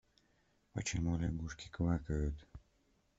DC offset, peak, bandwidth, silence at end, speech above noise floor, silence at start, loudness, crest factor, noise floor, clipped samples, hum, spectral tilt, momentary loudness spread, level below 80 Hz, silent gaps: under 0.1%; -22 dBFS; 8 kHz; 0.6 s; 37 dB; 0.75 s; -39 LUFS; 18 dB; -75 dBFS; under 0.1%; none; -6 dB/octave; 10 LU; -48 dBFS; none